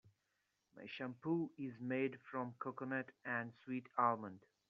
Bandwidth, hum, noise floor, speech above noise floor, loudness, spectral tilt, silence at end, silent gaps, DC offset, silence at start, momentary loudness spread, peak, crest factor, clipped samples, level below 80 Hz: 6.4 kHz; none; -85 dBFS; 43 dB; -43 LUFS; -5 dB/octave; 0.3 s; none; under 0.1%; 0.75 s; 10 LU; -22 dBFS; 22 dB; under 0.1%; -88 dBFS